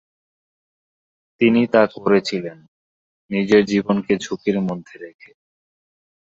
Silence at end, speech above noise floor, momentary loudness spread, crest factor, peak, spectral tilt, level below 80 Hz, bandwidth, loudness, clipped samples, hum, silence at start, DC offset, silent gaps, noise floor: 1.3 s; over 72 dB; 18 LU; 20 dB; -2 dBFS; -6 dB/octave; -60 dBFS; 7.8 kHz; -19 LUFS; under 0.1%; none; 1.4 s; under 0.1%; 2.68-3.29 s; under -90 dBFS